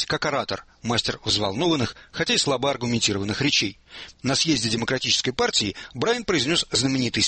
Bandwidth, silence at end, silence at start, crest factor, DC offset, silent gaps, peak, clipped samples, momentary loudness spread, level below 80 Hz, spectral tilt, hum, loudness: 8.8 kHz; 0 s; 0 s; 18 dB; under 0.1%; none; -6 dBFS; under 0.1%; 8 LU; -50 dBFS; -3 dB/octave; none; -23 LUFS